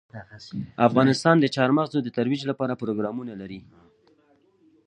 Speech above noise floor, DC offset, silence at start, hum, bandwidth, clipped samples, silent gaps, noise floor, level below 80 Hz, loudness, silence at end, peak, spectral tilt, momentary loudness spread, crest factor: 38 dB; under 0.1%; 0.15 s; none; 10.5 kHz; under 0.1%; none; -62 dBFS; -64 dBFS; -23 LUFS; 1.25 s; -2 dBFS; -6.5 dB/octave; 20 LU; 22 dB